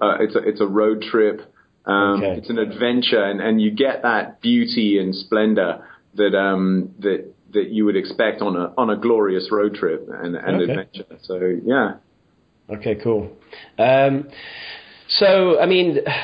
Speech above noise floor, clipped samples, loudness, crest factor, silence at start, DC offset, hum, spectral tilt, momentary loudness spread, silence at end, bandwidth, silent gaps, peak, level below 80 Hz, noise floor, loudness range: 41 dB; under 0.1%; -19 LUFS; 16 dB; 0 s; under 0.1%; none; -9.5 dB/octave; 14 LU; 0 s; 5.2 kHz; none; -4 dBFS; -56 dBFS; -60 dBFS; 4 LU